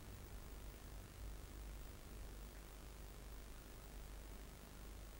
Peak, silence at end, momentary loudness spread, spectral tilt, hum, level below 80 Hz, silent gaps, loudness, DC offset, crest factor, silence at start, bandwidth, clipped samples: -38 dBFS; 0 s; 2 LU; -4.5 dB/octave; none; -56 dBFS; none; -57 LUFS; under 0.1%; 16 dB; 0 s; 16 kHz; under 0.1%